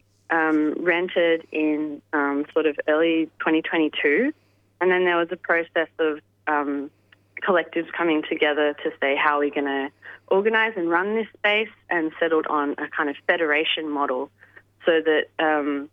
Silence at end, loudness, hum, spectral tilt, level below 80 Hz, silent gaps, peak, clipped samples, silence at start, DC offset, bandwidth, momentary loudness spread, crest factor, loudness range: 0.05 s; -23 LUFS; none; -6.5 dB/octave; -76 dBFS; none; -4 dBFS; under 0.1%; 0.3 s; under 0.1%; 4.7 kHz; 6 LU; 18 dB; 2 LU